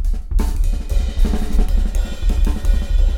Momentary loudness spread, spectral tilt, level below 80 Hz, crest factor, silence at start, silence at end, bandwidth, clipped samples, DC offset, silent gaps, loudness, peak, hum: 3 LU; -6.5 dB/octave; -16 dBFS; 12 dB; 0 s; 0 s; 12.5 kHz; under 0.1%; under 0.1%; none; -22 LUFS; -2 dBFS; none